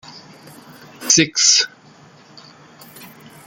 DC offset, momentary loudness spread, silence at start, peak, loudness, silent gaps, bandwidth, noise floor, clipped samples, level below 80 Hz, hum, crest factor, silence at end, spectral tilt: under 0.1%; 14 LU; 0.15 s; 0 dBFS; -13 LUFS; none; 17 kHz; -46 dBFS; under 0.1%; -62 dBFS; none; 22 dB; 0.4 s; -1 dB/octave